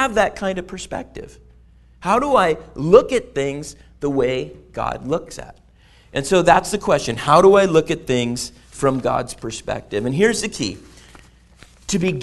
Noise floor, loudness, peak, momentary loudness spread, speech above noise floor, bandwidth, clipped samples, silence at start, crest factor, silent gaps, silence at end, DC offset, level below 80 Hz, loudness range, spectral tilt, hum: -49 dBFS; -19 LUFS; 0 dBFS; 17 LU; 31 dB; 12 kHz; under 0.1%; 0 s; 20 dB; none; 0 s; under 0.1%; -44 dBFS; 6 LU; -5 dB/octave; none